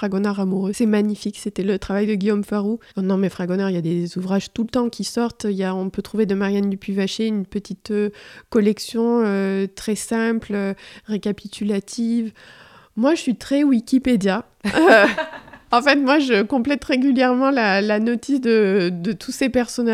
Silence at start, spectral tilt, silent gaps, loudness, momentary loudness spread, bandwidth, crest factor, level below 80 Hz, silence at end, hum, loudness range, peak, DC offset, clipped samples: 0 s; -5.5 dB/octave; none; -20 LUFS; 9 LU; 14.5 kHz; 20 dB; -52 dBFS; 0 s; none; 6 LU; 0 dBFS; under 0.1%; under 0.1%